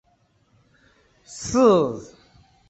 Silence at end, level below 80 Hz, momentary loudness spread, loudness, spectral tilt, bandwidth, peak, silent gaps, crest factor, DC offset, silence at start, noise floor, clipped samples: 0.65 s; -54 dBFS; 21 LU; -19 LUFS; -5.5 dB/octave; 8.2 kHz; -6 dBFS; none; 20 dB; under 0.1%; 1.3 s; -64 dBFS; under 0.1%